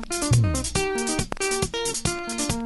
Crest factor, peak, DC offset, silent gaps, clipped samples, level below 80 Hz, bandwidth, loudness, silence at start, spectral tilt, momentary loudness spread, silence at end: 16 dB; -8 dBFS; under 0.1%; none; under 0.1%; -38 dBFS; 12 kHz; -24 LUFS; 0 s; -4 dB/octave; 5 LU; 0 s